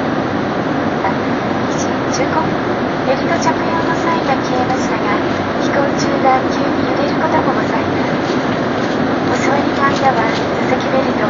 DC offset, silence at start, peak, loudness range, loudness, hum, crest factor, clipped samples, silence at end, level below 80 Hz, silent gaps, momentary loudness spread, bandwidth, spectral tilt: under 0.1%; 0 s; 0 dBFS; 1 LU; -15 LUFS; none; 14 dB; under 0.1%; 0 s; -44 dBFS; none; 4 LU; 7.4 kHz; -4.5 dB/octave